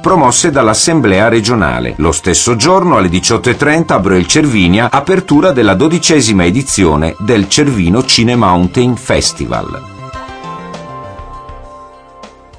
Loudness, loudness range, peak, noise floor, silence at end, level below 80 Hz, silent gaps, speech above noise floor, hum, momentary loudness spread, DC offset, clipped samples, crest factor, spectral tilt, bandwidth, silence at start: -9 LUFS; 7 LU; 0 dBFS; -35 dBFS; 0.3 s; -30 dBFS; none; 26 dB; none; 18 LU; under 0.1%; under 0.1%; 10 dB; -4 dB/octave; 10.5 kHz; 0 s